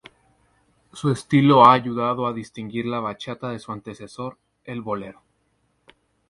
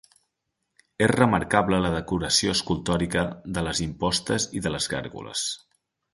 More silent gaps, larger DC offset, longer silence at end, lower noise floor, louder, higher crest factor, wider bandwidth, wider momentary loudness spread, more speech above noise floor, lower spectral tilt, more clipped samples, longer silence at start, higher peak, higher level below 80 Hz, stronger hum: neither; neither; first, 1.15 s vs 0.55 s; second, -68 dBFS vs -80 dBFS; first, -20 LUFS vs -25 LUFS; about the same, 22 dB vs 22 dB; about the same, 11.5 kHz vs 12 kHz; first, 21 LU vs 9 LU; second, 47 dB vs 55 dB; first, -7 dB/octave vs -4 dB/octave; neither; about the same, 0.95 s vs 1 s; first, 0 dBFS vs -4 dBFS; second, -60 dBFS vs -46 dBFS; neither